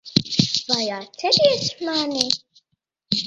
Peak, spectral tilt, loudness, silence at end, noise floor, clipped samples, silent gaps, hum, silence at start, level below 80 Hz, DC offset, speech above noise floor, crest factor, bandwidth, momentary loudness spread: 0 dBFS; -3.5 dB/octave; -20 LUFS; 0 s; -75 dBFS; under 0.1%; none; none; 0.05 s; -56 dBFS; under 0.1%; 53 dB; 22 dB; 11.5 kHz; 8 LU